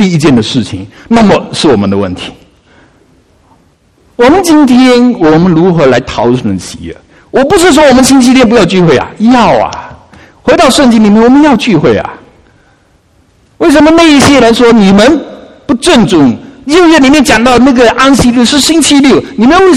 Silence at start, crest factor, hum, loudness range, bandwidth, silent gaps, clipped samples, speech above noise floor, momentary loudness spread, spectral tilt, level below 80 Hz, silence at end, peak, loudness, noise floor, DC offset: 0 s; 6 dB; none; 5 LU; 14 kHz; none; 5%; 42 dB; 12 LU; -5 dB/octave; -32 dBFS; 0 s; 0 dBFS; -5 LUFS; -46 dBFS; 0.5%